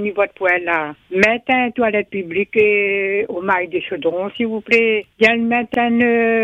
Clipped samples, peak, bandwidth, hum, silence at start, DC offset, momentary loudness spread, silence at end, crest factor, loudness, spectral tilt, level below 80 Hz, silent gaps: under 0.1%; 0 dBFS; 8.4 kHz; none; 0 s; under 0.1%; 7 LU; 0 s; 16 dB; -17 LUFS; -5.5 dB/octave; -56 dBFS; none